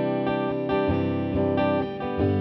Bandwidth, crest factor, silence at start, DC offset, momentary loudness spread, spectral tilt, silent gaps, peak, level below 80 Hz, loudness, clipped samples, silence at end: 5.8 kHz; 12 dB; 0 s; under 0.1%; 3 LU; -10.5 dB/octave; none; -12 dBFS; -46 dBFS; -25 LUFS; under 0.1%; 0 s